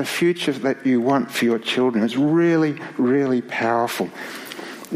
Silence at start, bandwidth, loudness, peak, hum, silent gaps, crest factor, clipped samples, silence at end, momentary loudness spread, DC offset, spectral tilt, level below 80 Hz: 0 s; 15.5 kHz; -20 LUFS; -6 dBFS; none; none; 14 dB; under 0.1%; 0 s; 12 LU; under 0.1%; -5.5 dB/octave; -70 dBFS